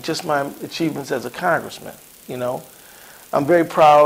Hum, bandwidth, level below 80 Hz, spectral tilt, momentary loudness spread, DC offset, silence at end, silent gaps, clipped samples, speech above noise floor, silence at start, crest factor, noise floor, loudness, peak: none; 16 kHz; -60 dBFS; -5 dB/octave; 24 LU; under 0.1%; 0 s; none; under 0.1%; 25 dB; 0.05 s; 16 dB; -43 dBFS; -20 LUFS; -2 dBFS